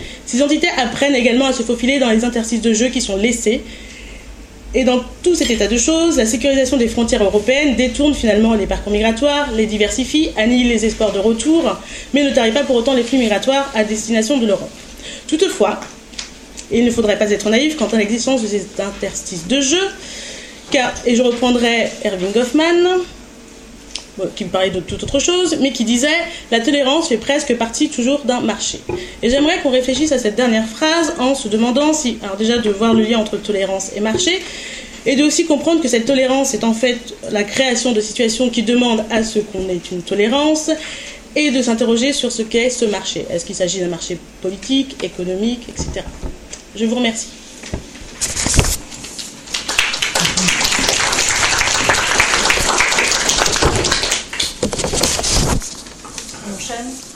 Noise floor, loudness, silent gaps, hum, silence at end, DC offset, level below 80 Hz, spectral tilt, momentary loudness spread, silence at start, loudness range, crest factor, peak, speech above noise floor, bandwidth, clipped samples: -38 dBFS; -16 LUFS; none; none; 0 s; under 0.1%; -34 dBFS; -3 dB/octave; 13 LU; 0 s; 5 LU; 16 dB; 0 dBFS; 22 dB; 16 kHz; under 0.1%